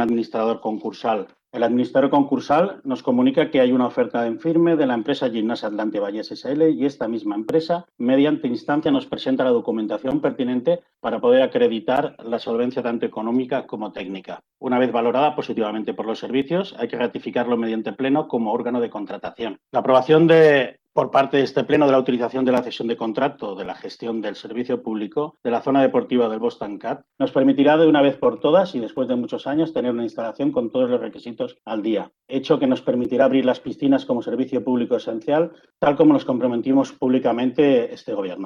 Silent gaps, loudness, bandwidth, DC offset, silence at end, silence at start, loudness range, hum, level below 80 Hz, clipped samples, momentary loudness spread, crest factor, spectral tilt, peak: none; -21 LUFS; 7 kHz; under 0.1%; 0 s; 0 s; 5 LU; none; -64 dBFS; under 0.1%; 11 LU; 16 dB; -7.5 dB/octave; -4 dBFS